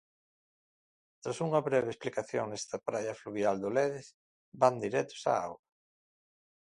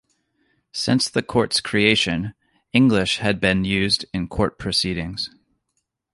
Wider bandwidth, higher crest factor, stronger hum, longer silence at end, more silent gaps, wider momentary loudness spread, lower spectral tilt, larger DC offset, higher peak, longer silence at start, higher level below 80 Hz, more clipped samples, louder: about the same, 11.5 kHz vs 11.5 kHz; about the same, 24 dB vs 20 dB; neither; first, 1.1 s vs 0.85 s; first, 4.14-4.52 s vs none; about the same, 11 LU vs 11 LU; about the same, -5 dB/octave vs -4.5 dB/octave; neither; second, -10 dBFS vs -2 dBFS; first, 1.25 s vs 0.75 s; second, -74 dBFS vs -44 dBFS; neither; second, -33 LUFS vs -20 LUFS